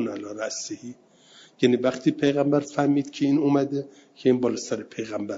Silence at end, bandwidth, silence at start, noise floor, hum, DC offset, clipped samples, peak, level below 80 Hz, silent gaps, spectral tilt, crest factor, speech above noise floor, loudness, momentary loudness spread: 0 s; 7.8 kHz; 0 s; -53 dBFS; none; under 0.1%; under 0.1%; -6 dBFS; -68 dBFS; none; -5.5 dB/octave; 18 dB; 29 dB; -24 LUFS; 11 LU